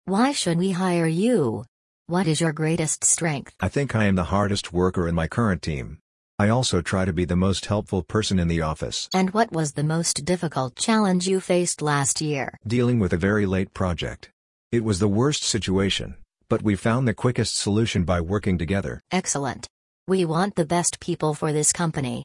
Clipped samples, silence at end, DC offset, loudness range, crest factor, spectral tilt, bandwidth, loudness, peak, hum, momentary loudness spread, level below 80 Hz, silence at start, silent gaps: under 0.1%; 0 s; under 0.1%; 2 LU; 18 dB; -4.5 dB/octave; 12 kHz; -23 LUFS; -6 dBFS; none; 6 LU; -48 dBFS; 0.05 s; 1.68-2.05 s, 6.01-6.38 s, 14.33-14.70 s, 19.70-20.06 s